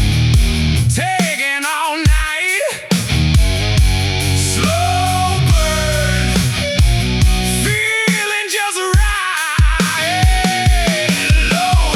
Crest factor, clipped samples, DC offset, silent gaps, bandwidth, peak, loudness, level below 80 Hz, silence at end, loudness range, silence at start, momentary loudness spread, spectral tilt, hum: 12 dB; under 0.1%; under 0.1%; none; 17 kHz; -2 dBFS; -14 LUFS; -18 dBFS; 0 s; 1 LU; 0 s; 3 LU; -4 dB/octave; none